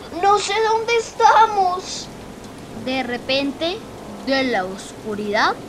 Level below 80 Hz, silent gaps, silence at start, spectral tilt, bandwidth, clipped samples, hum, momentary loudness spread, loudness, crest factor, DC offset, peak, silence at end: -50 dBFS; none; 0 s; -3 dB/octave; 15 kHz; under 0.1%; none; 19 LU; -19 LUFS; 18 dB; under 0.1%; -2 dBFS; 0 s